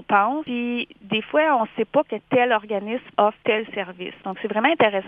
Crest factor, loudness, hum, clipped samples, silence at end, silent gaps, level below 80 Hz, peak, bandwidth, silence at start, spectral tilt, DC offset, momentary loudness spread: 20 dB; -22 LUFS; none; under 0.1%; 0 s; none; -66 dBFS; -2 dBFS; 4.9 kHz; 0 s; -7.5 dB/octave; under 0.1%; 11 LU